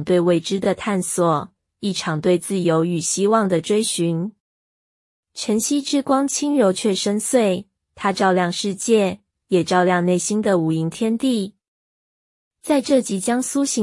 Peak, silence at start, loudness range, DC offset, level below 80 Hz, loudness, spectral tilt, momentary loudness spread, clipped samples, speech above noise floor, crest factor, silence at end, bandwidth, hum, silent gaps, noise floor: -4 dBFS; 0 s; 2 LU; under 0.1%; -62 dBFS; -20 LUFS; -4.5 dB/octave; 7 LU; under 0.1%; over 71 dB; 16 dB; 0 s; 12 kHz; none; 4.40-5.23 s, 11.68-12.51 s; under -90 dBFS